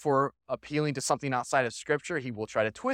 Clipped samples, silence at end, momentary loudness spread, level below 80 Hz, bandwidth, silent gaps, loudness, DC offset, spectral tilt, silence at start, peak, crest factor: under 0.1%; 0 s; 6 LU; -66 dBFS; 16.5 kHz; none; -30 LUFS; under 0.1%; -4.5 dB/octave; 0 s; -10 dBFS; 18 dB